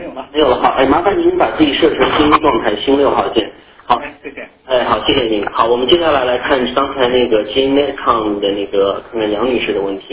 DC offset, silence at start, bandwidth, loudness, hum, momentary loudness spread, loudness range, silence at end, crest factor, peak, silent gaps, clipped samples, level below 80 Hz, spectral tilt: under 0.1%; 0 s; 4 kHz; -14 LUFS; none; 7 LU; 3 LU; 0 s; 14 dB; 0 dBFS; none; under 0.1%; -40 dBFS; -9 dB/octave